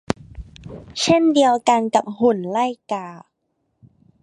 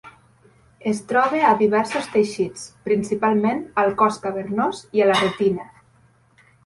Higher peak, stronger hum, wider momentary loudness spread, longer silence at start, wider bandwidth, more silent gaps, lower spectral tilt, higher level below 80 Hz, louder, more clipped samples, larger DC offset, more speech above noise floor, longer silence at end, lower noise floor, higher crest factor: first, 0 dBFS vs -4 dBFS; neither; first, 22 LU vs 10 LU; about the same, 0.1 s vs 0.05 s; about the same, 11 kHz vs 11.5 kHz; neither; about the same, -4.5 dB/octave vs -5 dB/octave; first, -48 dBFS vs -60 dBFS; about the same, -19 LUFS vs -21 LUFS; neither; neither; first, 53 dB vs 37 dB; about the same, 1.05 s vs 1 s; first, -72 dBFS vs -57 dBFS; about the same, 20 dB vs 18 dB